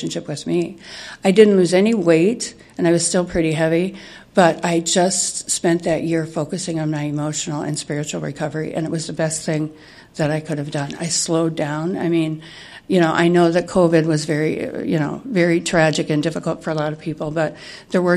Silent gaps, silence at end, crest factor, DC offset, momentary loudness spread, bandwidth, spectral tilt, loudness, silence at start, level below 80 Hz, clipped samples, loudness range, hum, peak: none; 0 s; 18 dB; under 0.1%; 10 LU; 12.5 kHz; -5 dB/octave; -19 LUFS; 0 s; -52 dBFS; under 0.1%; 6 LU; none; 0 dBFS